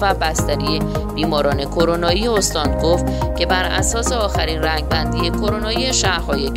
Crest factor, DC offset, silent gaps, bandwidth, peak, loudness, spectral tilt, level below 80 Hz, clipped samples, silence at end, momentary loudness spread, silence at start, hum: 16 dB; under 0.1%; none; 16 kHz; -2 dBFS; -18 LUFS; -4 dB/octave; -26 dBFS; under 0.1%; 0 s; 3 LU; 0 s; none